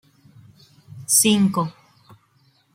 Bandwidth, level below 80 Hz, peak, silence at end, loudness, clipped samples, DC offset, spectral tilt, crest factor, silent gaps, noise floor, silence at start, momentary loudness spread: 16.5 kHz; -64 dBFS; -4 dBFS; 1.05 s; -18 LUFS; under 0.1%; under 0.1%; -3.5 dB/octave; 20 dB; none; -61 dBFS; 0.95 s; 16 LU